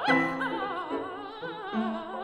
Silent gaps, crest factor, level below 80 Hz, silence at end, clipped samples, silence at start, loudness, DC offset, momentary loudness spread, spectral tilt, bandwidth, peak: none; 18 dB; -64 dBFS; 0 s; under 0.1%; 0 s; -31 LUFS; under 0.1%; 13 LU; -5.5 dB/octave; 11.5 kHz; -12 dBFS